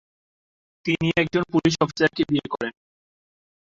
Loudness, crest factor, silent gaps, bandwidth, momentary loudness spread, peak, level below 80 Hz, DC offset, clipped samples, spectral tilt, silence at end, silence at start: -23 LUFS; 20 dB; none; 7.6 kHz; 9 LU; -6 dBFS; -56 dBFS; under 0.1%; under 0.1%; -5.5 dB/octave; 0.95 s; 0.85 s